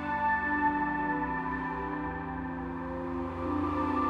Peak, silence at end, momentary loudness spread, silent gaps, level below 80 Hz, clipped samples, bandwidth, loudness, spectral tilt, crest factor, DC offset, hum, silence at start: -16 dBFS; 0 s; 8 LU; none; -48 dBFS; under 0.1%; 6.8 kHz; -32 LUFS; -8 dB/octave; 16 dB; under 0.1%; none; 0 s